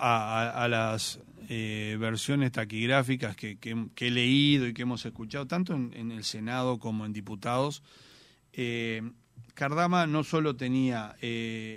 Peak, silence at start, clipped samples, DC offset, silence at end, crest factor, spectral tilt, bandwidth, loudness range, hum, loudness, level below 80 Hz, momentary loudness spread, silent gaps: -8 dBFS; 0 s; under 0.1%; under 0.1%; 0 s; 22 dB; -5 dB/octave; 15.5 kHz; 6 LU; none; -30 LUFS; -66 dBFS; 11 LU; none